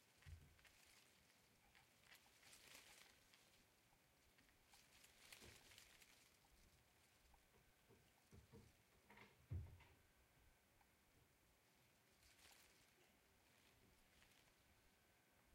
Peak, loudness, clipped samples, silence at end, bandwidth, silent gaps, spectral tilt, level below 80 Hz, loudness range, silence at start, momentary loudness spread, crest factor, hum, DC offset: -44 dBFS; -64 LUFS; under 0.1%; 0 s; 16 kHz; none; -3.5 dB/octave; -78 dBFS; 5 LU; 0 s; 12 LU; 26 dB; none; under 0.1%